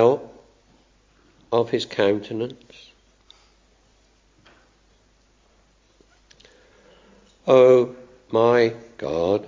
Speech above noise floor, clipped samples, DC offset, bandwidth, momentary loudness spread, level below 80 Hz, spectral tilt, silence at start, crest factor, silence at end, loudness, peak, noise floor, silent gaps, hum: 41 dB; under 0.1%; under 0.1%; 7.6 kHz; 16 LU; -58 dBFS; -6.5 dB/octave; 0 s; 20 dB; 0 s; -20 LUFS; -4 dBFS; -60 dBFS; none; none